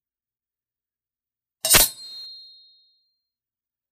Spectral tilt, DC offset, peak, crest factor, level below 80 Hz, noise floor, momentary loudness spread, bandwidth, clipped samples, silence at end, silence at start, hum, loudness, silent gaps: 0 dB/octave; under 0.1%; 0 dBFS; 28 dB; -44 dBFS; under -90 dBFS; 22 LU; 15.5 kHz; under 0.1%; 1.6 s; 1.65 s; none; -17 LUFS; none